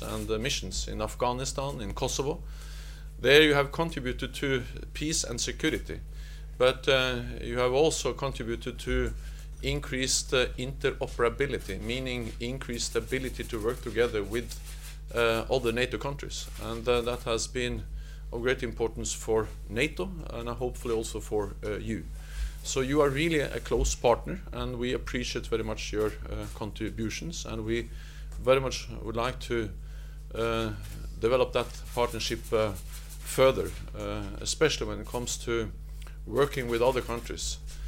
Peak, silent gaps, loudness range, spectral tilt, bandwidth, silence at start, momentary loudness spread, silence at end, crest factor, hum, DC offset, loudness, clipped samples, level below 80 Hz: -6 dBFS; none; 5 LU; -4 dB/octave; 16.5 kHz; 0 s; 13 LU; 0 s; 24 dB; none; under 0.1%; -30 LUFS; under 0.1%; -40 dBFS